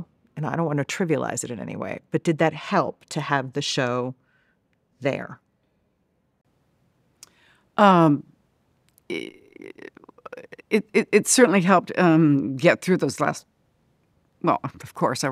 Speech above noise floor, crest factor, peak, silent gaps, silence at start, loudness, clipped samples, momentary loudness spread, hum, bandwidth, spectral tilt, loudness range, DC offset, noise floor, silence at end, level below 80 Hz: 48 dB; 22 dB; -2 dBFS; none; 0 s; -22 LUFS; under 0.1%; 21 LU; none; 15 kHz; -5 dB/octave; 11 LU; under 0.1%; -69 dBFS; 0 s; -70 dBFS